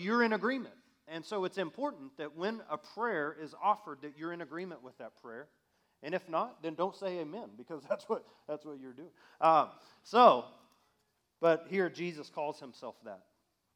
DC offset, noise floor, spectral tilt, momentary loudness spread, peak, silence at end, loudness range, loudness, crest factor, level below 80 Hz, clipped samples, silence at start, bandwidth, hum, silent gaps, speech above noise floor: under 0.1%; -78 dBFS; -6 dB/octave; 21 LU; -10 dBFS; 0.6 s; 10 LU; -33 LUFS; 26 dB; under -90 dBFS; under 0.1%; 0 s; 12.5 kHz; none; none; 44 dB